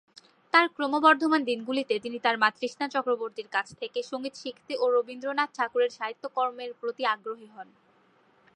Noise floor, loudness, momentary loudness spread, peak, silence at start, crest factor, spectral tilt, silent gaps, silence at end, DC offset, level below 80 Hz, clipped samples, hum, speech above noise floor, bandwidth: -63 dBFS; -27 LUFS; 13 LU; -6 dBFS; 0.55 s; 22 dB; -3.5 dB/octave; none; 0.95 s; under 0.1%; -82 dBFS; under 0.1%; none; 36 dB; 10.5 kHz